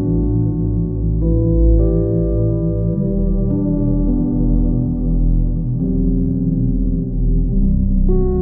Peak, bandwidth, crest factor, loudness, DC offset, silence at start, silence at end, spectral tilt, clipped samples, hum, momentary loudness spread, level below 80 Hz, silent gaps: -2 dBFS; 1.3 kHz; 12 dB; -18 LUFS; under 0.1%; 0 s; 0 s; -17 dB/octave; under 0.1%; none; 4 LU; -18 dBFS; none